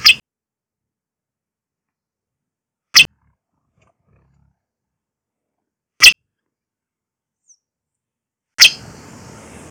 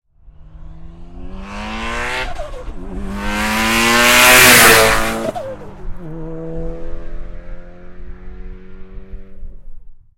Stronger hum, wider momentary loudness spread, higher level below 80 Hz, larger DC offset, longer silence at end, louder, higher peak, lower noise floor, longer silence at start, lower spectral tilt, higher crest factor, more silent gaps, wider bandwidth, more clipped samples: neither; second, 21 LU vs 28 LU; second, -56 dBFS vs -30 dBFS; neither; first, 0.95 s vs 0.25 s; about the same, -10 LUFS vs -10 LUFS; about the same, 0 dBFS vs 0 dBFS; first, -89 dBFS vs -41 dBFS; second, 0.05 s vs 0.25 s; second, 2 dB/octave vs -1.5 dB/octave; about the same, 20 dB vs 16 dB; neither; second, 16.5 kHz vs over 20 kHz; first, 0.1% vs under 0.1%